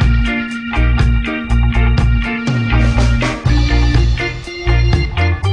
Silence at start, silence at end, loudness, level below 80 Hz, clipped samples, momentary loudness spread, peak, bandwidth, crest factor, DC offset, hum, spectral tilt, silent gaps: 0 s; 0 s; -15 LUFS; -16 dBFS; under 0.1%; 4 LU; 0 dBFS; 9.6 kHz; 12 dB; under 0.1%; none; -6.5 dB/octave; none